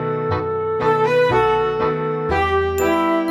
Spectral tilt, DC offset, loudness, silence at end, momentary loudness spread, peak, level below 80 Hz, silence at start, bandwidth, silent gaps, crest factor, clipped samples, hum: -6 dB/octave; under 0.1%; -18 LUFS; 0 s; 6 LU; -4 dBFS; -38 dBFS; 0 s; 14.5 kHz; none; 14 dB; under 0.1%; none